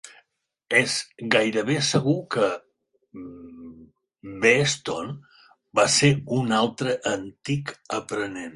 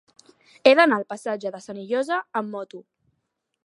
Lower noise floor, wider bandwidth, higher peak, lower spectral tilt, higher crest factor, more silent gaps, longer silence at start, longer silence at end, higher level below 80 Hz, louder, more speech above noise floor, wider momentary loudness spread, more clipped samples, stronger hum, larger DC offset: second, -73 dBFS vs -77 dBFS; about the same, 11.5 kHz vs 11.5 kHz; second, -4 dBFS vs 0 dBFS; about the same, -4 dB/octave vs -4.5 dB/octave; about the same, 22 dB vs 24 dB; neither; second, 0.05 s vs 0.65 s; second, 0 s vs 0.85 s; first, -60 dBFS vs -78 dBFS; about the same, -23 LUFS vs -22 LUFS; second, 50 dB vs 55 dB; first, 22 LU vs 19 LU; neither; neither; neither